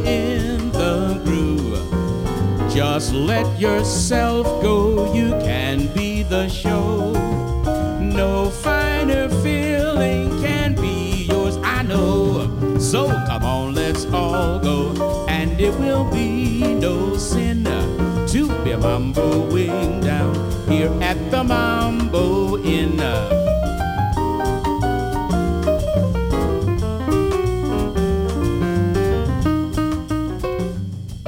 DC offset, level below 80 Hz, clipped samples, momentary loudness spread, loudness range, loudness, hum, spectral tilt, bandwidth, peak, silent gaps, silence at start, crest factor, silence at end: under 0.1%; -28 dBFS; under 0.1%; 3 LU; 1 LU; -20 LUFS; none; -6 dB/octave; 16.5 kHz; -4 dBFS; none; 0 s; 14 dB; 0 s